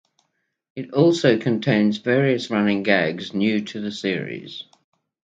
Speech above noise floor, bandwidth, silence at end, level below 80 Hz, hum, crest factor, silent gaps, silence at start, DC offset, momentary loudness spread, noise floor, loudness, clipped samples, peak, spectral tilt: 53 dB; 8 kHz; 0.6 s; -66 dBFS; none; 20 dB; none; 0.75 s; under 0.1%; 15 LU; -73 dBFS; -21 LUFS; under 0.1%; -2 dBFS; -6.5 dB/octave